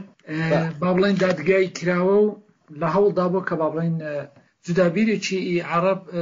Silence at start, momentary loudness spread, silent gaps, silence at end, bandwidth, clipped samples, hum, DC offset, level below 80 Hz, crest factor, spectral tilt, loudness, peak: 0 s; 9 LU; none; 0 s; 7.6 kHz; under 0.1%; none; under 0.1%; -62 dBFS; 14 dB; -6.5 dB/octave; -21 LUFS; -8 dBFS